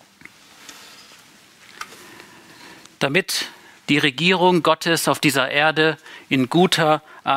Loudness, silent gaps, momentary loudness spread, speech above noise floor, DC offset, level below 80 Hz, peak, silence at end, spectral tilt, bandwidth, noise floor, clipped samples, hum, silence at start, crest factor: -18 LUFS; none; 20 LU; 31 dB; under 0.1%; -66 dBFS; -2 dBFS; 0 s; -4 dB/octave; 16 kHz; -49 dBFS; under 0.1%; none; 0.7 s; 20 dB